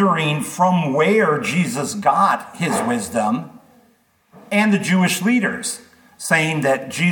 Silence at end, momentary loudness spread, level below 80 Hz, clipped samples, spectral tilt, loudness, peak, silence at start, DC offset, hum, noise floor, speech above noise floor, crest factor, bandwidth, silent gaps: 0 s; 7 LU; -66 dBFS; under 0.1%; -5 dB/octave; -18 LUFS; -2 dBFS; 0 s; under 0.1%; none; -58 dBFS; 40 dB; 16 dB; 19 kHz; none